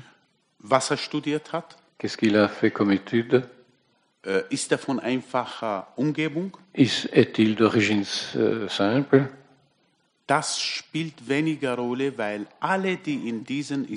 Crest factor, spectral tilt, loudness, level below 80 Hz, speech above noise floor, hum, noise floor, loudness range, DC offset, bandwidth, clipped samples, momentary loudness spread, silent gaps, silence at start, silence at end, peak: 20 dB; -5 dB/octave; -25 LUFS; -72 dBFS; 44 dB; none; -68 dBFS; 5 LU; under 0.1%; 10.5 kHz; under 0.1%; 10 LU; none; 0.65 s; 0 s; -4 dBFS